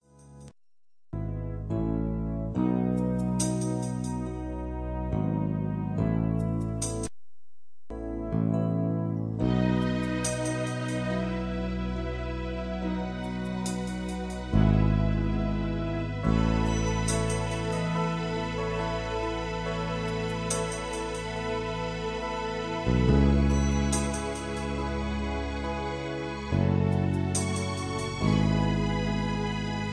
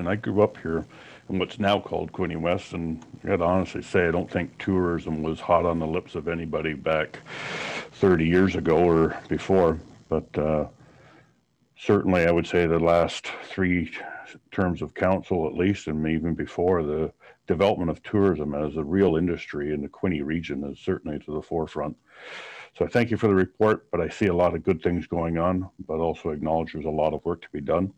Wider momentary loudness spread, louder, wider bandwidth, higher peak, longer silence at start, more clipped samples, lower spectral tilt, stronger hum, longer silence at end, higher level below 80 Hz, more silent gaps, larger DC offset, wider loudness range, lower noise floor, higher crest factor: second, 8 LU vs 11 LU; second, -29 LUFS vs -25 LUFS; first, 11 kHz vs 9.8 kHz; about the same, -10 dBFS vs -8 dBFS; first, 0.2 s vs 0 s; neither; second, -6 dB/octave vs -7.5 dB/octave; neither; about the same, 0 s vs 0.05 s; first, -36 dBFS vs -48 dBFS; neither; neither; about the same, 4 LU vs 4 LU; first, under -90 dBFS vs -65 dBFS; about the same, 18 dB vs 18 dB